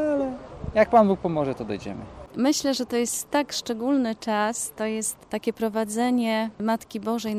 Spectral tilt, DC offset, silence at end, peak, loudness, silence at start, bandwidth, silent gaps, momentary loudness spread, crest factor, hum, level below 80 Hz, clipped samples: -4 dB/octave; under 0.1%; 0 s; -6 dBFS; -25 LUFS; 0 s; 15.5 kHz; none; 11 LU; 20 dB; none; -52 dBFS; under 0.1%